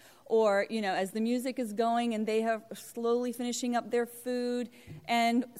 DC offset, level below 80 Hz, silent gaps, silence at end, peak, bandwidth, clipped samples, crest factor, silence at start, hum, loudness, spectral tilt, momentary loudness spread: under 0.1%; -76 dBFS; none; 0 s; -16 dBFS; 16 kHz; under 0.1%; 14 dB; 0.3 s; none; -31 LUFS; -4 dB/octave; 8 LU